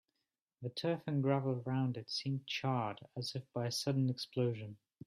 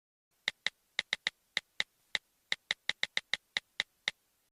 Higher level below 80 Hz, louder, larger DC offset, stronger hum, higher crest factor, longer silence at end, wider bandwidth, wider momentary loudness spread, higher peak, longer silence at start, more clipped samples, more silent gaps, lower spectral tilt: about the same, -78 dBFS vs -76 dBFS; about the same, -38 LUFS vs -37 LUFS; neither; neither; second, 18 dB vs 28 dB; about the same, 0.3 s vs 0.4 s; second, 14 kHz vs 15.5 kHz; first, 9 LU vs 5 LU; second, -20 dBFS vs -12 dBFS; first, 0.6 s vs 0.45 s; neither; neither; first, -6 dB/octave vs 1 dB/octave